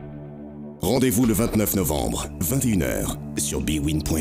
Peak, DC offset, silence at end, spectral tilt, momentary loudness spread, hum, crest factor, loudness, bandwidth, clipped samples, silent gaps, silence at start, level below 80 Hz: -10 dBFS; under 0.1%; 0 s; -5 dB/octave; 18 LU; none; 14 dB; -23 LUFS; 16 kHz; under 0.1%; none; 0 s; -36 dBFS